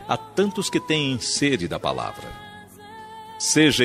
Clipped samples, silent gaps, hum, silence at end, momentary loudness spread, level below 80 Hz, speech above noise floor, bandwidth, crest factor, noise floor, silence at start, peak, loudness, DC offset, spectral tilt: under 0.1%; none; none; 0 s; 21 LU; -54 dBFS; 20 dB; 15 kHz; 18 dB; -42 dBFS; 0 s; -4 dBFS; -22 LUFS; under 0.1%; -3.5 dB/octave